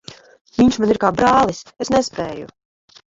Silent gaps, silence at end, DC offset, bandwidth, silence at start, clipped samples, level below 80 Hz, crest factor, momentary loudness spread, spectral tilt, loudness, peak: 0.41-0.45 s; 0.6 s; under 0.1%; 7.8 kHz; 0.1 s; under 0.1%; -46 dBFS; 16 dB; 14 LU; -5 dB/octave; -17 LUFS; -2 dBFS